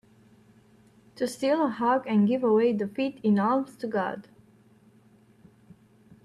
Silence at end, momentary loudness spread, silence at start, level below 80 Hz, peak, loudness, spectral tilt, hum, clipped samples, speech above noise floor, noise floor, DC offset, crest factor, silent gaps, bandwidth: 2.05 s; 10 LU; 1.15 s; -72 dBFS; -14 dBFS; -26 LUFS; -7 dB/octave; none; under 0.1%; 33 dB; -58 dBFS; under 0.1%; 14 dB; none; 12.5 kHz